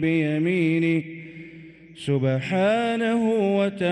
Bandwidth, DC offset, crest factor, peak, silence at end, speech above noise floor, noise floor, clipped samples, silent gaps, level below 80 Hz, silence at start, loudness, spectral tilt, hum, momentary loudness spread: 11 kHz; under 0.1%; 12 dB; -10 dBFS; 0 s; 23 dB; -45 dBFS; under 0.1%; none; -64 dBFS; 0 s; -22 LUFS; -7.5 dB/octave; none; 17 LU